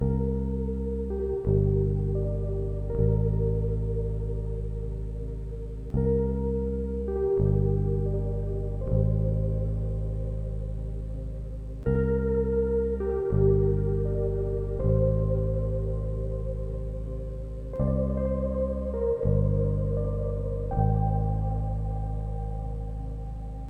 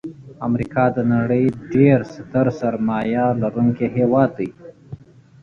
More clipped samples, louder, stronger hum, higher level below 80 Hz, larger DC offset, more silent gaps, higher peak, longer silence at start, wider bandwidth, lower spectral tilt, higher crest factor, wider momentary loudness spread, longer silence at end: neither; second, -29 LUFS vs -19 LUFS; neither; first, -32 dBFS vs -50 dBFS; neither; neither; second, -10 dBFS vs -2 dBFS; about the same, 0 s vs 0.05 s; second, 2.3 kHz vs 6.8 kHz; first, -12 dB/octave vs -10 dB/octave; about the same, 16 dB vs 16 dB; second, 10 LU vs 13 LU; second, 0 s vs 0.45 s